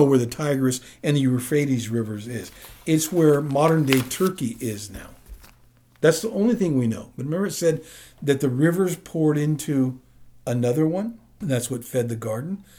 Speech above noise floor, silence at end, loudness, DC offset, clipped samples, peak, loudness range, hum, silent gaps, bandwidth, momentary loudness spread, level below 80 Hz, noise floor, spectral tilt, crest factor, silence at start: 33 dB; 0.15 s; -23 LUFS; under 0.1%; under 0.1%; 0 dBFS; 3 LU; none; none; over 20 kHz; 13 LU; -54 dBFS; -55 dBFS; -6 dB/octave; 22 dB; 0 s